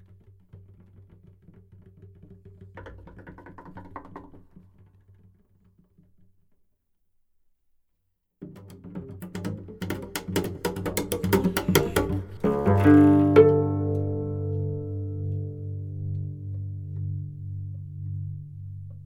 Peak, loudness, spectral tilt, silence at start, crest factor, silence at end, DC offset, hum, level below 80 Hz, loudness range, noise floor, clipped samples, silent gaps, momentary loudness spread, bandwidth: -4 dBFS; -25 LUFS; -7 dB/octave; 0.55 s; 24 dB; 0 s; under 0.1%; none; -50 dBFS; 26 LU; -74 dBFS; under 0.1%; none; 28 LU; over 20 kHz